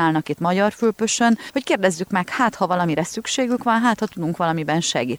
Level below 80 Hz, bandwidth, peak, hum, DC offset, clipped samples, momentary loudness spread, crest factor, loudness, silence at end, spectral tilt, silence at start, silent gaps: -60 dBFS; 16.5 kHz; -4 dBFS; none; under 0.1%; under 0.1%; 5 LU; 16 dB; -20 LUFS; 0 s; -4.5 dB/octave; 0 s; none